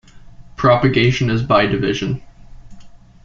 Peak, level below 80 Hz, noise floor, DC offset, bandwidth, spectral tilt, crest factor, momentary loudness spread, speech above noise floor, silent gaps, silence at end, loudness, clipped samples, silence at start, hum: -2 dBFS; -40 dBFS; -39 dBFS; under 0.1%; 7.6 kHz; -6.5 dB/octave; 16 dB; 9 LU; 24 dB; none; 0.3 s; -16 LUFS; under 0.1%; 0.15 s; none